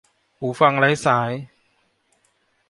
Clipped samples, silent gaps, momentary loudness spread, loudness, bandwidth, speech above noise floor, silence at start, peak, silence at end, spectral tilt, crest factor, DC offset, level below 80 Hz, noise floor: under 0.1%; none; 14 LU; -19 LUFS; 11.5 kHz; 47 dB; 0.4 s; -2 dBFS; 1.25 s; -5.5 dB/octave; 20 dB; under 0.1%; -64 dBFS; -66 dBFS